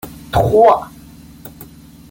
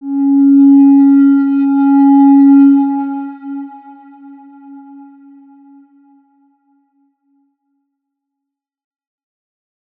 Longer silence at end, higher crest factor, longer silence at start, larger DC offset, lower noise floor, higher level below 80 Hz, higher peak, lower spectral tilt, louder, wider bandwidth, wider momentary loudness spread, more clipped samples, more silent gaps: second, 0.45 s vs 5.2 s; about the same, 16 dB vs 12 dB; about the same, 0.05 s vs 0 s; neither; second, -39 dBFS vs -80 dBFS; first, -38 dBFS vs -86 dBFS; about the same, -2 dBFS vs -2 dBFS; second, -6.5 dB/octave vs -10.5 dB/octave; second, -13 LUFS vs -8 LUFS; first, 17 kHz vs 2.6 kHz; first, 25 LU vs 19 LU; neither; neither